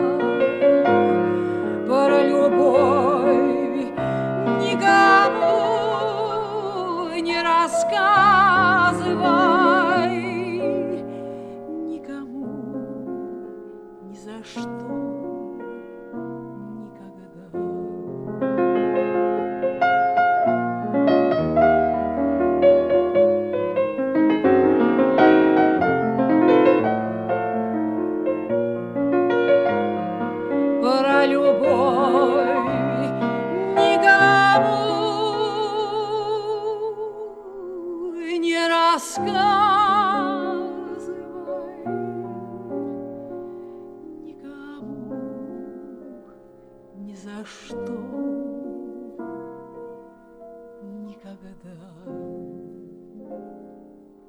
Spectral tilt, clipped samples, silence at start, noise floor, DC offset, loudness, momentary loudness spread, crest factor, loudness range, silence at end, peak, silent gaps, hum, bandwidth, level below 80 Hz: -5.5 dB/octave; under 0.1%; 0 s; -48 dBFS; under 0.1%; -19 LUFS; 21 LU; 18 dB; 18 LU; 0.5 s; -2 dBFS; none; none; 12 kHz; -56 dBFS